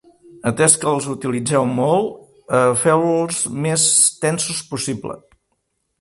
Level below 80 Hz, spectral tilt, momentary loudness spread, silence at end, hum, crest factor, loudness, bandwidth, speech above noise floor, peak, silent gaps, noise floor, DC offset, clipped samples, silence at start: -58 dBFS; -3.5 dB/octave; 12 LU; 0.8 s; none; 18 dB; -17 LUFS; 12 kHz; 53 dB; 0 dBFS; none; -71 dBFS; under 0.1%; under 0.1%; 0.35 s